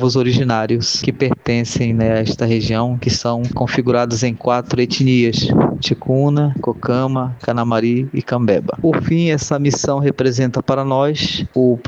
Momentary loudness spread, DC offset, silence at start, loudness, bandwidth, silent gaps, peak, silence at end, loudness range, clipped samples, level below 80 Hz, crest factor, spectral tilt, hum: 4 LU; under 0.1%; 0 s; -16 LUFS; 8 kHz; none; 0 dBFS; 0 s; 1 LU; under 0.1%; -44 dBFS; 16 dB; -6 dB/octave; none